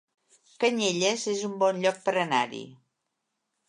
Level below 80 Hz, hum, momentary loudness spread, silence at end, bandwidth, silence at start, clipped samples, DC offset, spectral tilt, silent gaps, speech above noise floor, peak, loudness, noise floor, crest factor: -80 dBFS; none; 5 LU; 0.95 s; 11 kHz; 0.6 s; under 0.1%; under 0.1%; -3 dB/octave; none; 55 dB; -10 dBFS; -26 LUFS; -81 dBFS; 18 dB